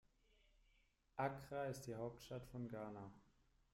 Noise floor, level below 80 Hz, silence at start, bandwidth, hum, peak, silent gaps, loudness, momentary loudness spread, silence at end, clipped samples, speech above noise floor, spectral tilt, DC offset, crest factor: -78 dBFS; -74 dBFS; 1.15 s; 16 kHz; none; -30 dBFS; none; -50 LUFS; 10 LU; 0.5 s; under 0.1%; 30 dB; -6 dB/octave; under 0.1%; 22 dB